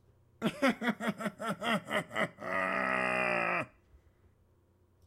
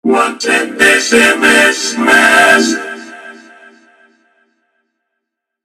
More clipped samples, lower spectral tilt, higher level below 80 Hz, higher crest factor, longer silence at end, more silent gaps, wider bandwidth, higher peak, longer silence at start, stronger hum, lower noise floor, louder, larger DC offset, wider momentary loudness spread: neither; first, -5 dB/octave vs -1.5 dB/octave; second, -70 dBFS vs -52 dBFS; first, 18 dB vs 12 dB; second, 1.4 s vs 2.35 s; neither; about the same, 16 kHz vs 16 kHz; second, -16 dBFS vs 0 dBFS; first, 0.4 s vs 0.05 s; neither; second, -68 dBFS vs -75 dBFS; second, -33 LUFS vs -9 LUFS; neither; second, 7 LU vs 14 LU